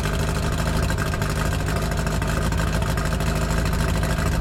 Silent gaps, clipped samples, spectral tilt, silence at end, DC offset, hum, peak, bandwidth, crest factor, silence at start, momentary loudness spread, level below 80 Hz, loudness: none; under 0.1%; -5.5 dB/octave; 0 s; under 0.1%; none; -10 dBFS; 16.5 kHz; 12 dB; 0 s; 1 LU; -26 dBFS; -23 LUFS